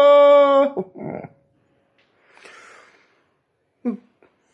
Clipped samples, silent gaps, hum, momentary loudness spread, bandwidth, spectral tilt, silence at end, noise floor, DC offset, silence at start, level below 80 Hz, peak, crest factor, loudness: under 0.1%; none; none; 23 LU; 7.6 kHz; -6 dB/octave; 0.55 s; -69 dBFS; under 0.1%; 0 s; -74 dBFS; -4 dBFS; 14 dB; -16 LUFS